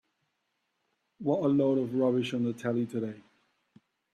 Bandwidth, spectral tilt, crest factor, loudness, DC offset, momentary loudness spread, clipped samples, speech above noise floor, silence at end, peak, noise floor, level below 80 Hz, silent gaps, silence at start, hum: 11.5 kHz; -7.5 dB/octave; 16 dB; -29 LUFS; under 0.1%; 10 LU; under 0.1%; 51 dB; 0.95 s; -14 dBFS; -80 dBFS; -72 dBFS; none; 1.2 s; none